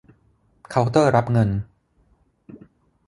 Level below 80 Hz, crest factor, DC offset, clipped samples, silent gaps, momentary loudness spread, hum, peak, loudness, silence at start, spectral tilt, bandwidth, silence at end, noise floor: -48 dBFS; 20 dB; under 0.1%; under 0.1%; none; 11 LU; none; -2 dBFS; -20 LUFS; 0.7 s; -7.5 dB/octave; 11.5 kHz; 0.5 s; -62 dBFS